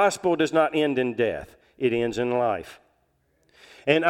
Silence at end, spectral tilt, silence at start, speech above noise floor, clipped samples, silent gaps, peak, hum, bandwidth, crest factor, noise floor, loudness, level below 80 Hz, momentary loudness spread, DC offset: 0 s; -5 dB/octave; 0 s; 45 dB; under 0.1%; none; -4 dBFS; none; 15 kHz; 22 dB; -68 dBFS; -24 LUFS; -58 dBFS; 10 LU; under 0.1%